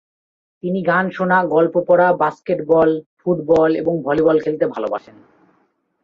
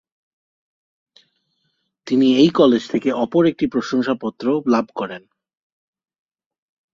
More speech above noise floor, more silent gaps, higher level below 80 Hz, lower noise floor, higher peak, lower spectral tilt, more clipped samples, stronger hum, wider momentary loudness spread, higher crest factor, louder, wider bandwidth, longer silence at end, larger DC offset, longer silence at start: second, 47 dB vs 53 dB; first, 3.06-3.17 s vs none; first, -56 dBFS vs -62 dBFS; second, -63 dBFS vs -71 dBFS; about the same, -2 dBFS vs -2 dBFS; first, -8.5 dB/octave vs -6.5 dB/octave; neither; neither; about the same, 10 LU vs 12 LU; about the same, 16 dB vs 18 dB; about the same, -17 LUFS vs -18 LUFS; second, 6.8 kHz vs 7.6 kHz; second, 1.05 s vs 1.75 s; neither; second, 0.65 s vs 2.05 s